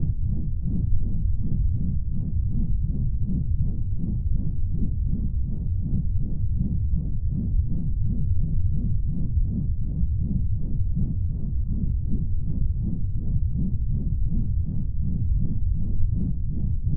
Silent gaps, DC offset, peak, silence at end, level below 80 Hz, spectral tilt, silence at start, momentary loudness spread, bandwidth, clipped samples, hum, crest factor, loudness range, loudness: none; under 0.1%; -8 dBFS; 0 s; -26 dBFS; -16 dB/octave; 0 s; 2 LU; 0.9 kHz; under 0.1%; none; 14 dB; 1 LU; -28 LUFS